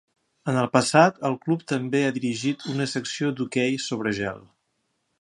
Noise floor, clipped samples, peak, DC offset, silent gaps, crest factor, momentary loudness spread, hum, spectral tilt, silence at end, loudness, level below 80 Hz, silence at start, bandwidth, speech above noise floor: -74 dBFS; under 0.1%; -2 dBFS; under 0.1%; none; 24 dB; 9 LU; none; -5 dB/octave; 0.8 s; -24 LUFS; -64 dBFS; 0.45 s; 11.5 kHz; 50 dB